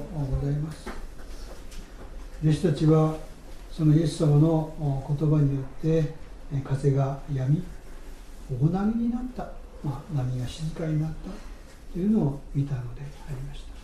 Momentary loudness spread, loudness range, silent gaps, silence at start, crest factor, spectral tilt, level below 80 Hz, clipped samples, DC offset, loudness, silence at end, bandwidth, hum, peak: 22 LU; 6 LU; none; 0 s; 16 dB; -8.5 dB/octave; -40 dBFS; under 0.1%; under 0.1%; -26 LUFS; 0 s; 11.5 kHz; none; -10 dBFS